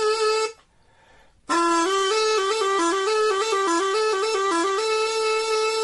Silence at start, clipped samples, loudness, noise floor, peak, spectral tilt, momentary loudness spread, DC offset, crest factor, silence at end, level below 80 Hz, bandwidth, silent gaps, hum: 0 s; under 0.1%; -22 LUFS; -57 dBFS; -10 dBFS; -0.5 dB/octave; 2 LU; under 0.1%; 12 dB; 0 s; -64 dBFS; 11.5 kHz; none; none